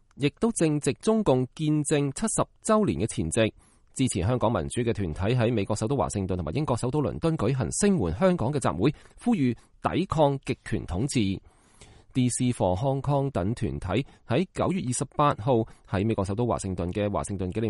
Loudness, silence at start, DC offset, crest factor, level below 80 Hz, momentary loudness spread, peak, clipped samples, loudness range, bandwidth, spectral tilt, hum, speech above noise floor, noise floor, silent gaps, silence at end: -27 LUFS; 0.15 s; under 0.1%; 18 dB; -46 dBFS; 6 LU; -8 dBFS; under 0.1%; 2 LU; 11.5 kHz; -6 dB/octave; none; 27 dB; -53 dBFS; none; 0 s